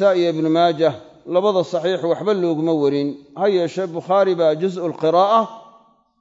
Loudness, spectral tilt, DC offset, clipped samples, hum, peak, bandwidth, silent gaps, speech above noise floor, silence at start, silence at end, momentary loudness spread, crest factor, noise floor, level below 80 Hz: -19 LUFS; -6.5 dB/octave; under 0.1%; under 0.1%; none; -4 dBFS; 7.8 kHz; none; 35 dB; 0 s; 0.6 s; 7 LU; 16 dB; -53 dBFS; -72 dBFS